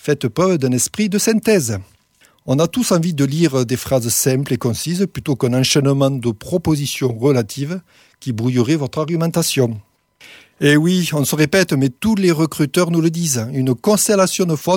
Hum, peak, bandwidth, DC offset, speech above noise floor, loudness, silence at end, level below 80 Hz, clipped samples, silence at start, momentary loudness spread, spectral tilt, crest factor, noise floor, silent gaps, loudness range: none; -2 dBFS; 18.5 kHz; under 0.1%; 38 dB; -17 LUFS; 0 s; -50 dBFS; under 0.1%; 0.05 s; 7 LU; -5 dB/octave; 14 dB; -55 dBFS; none; 3 LU